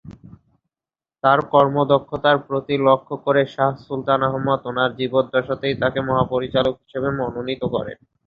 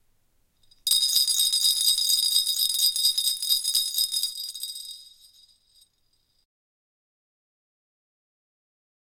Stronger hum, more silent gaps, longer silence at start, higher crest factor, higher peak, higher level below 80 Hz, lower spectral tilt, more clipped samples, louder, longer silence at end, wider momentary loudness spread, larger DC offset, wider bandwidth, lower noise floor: neither; neither; second, 0.05 s vs 0.85 s; about the same, 20 dB vs 22 dB; first, -2 dBFS vs -6 dBFS; first, -52 dBFS vs -68 dBFS; first, -8.5 dB/octave vs 5.5 dB/octave; neither; about the same, -20 LUFS vs -21 LUFS; second, 0.35 s vs 4 s; second, 8 LU vs 13 LU; neither; second, 5.2 kHz vs 17 kHz; first, under -90 dBFS vs -69 dBFS